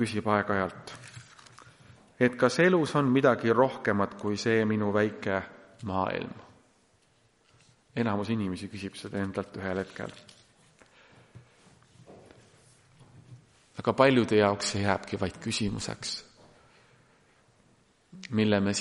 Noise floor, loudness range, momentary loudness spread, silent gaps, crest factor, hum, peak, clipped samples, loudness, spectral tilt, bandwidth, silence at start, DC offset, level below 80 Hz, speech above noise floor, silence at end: -66 dBFS; 12 LU; 18 LU; none; 24 dB; none; -6 dBFS; under 0.1%; -28 LUFS; -5.5 dB/octave; 11.5 kHz; 0 s; under 0.1%; -64 dBFS; 39 dB; 0 s